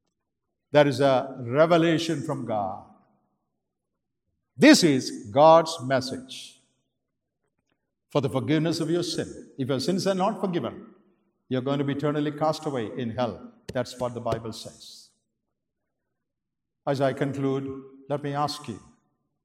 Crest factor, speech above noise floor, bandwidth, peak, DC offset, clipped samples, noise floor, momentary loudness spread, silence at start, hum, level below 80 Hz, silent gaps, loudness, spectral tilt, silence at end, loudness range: 22 dB; 62 dB; 15 kHz; -4 dBFS; under 0.1%; under 0.1%; -86 dBFS; 18 LU; 0.75 s; none; -66 dBFS; none; -24 LUFS; -5.5 dB/octave; 0.65 s; 11 LU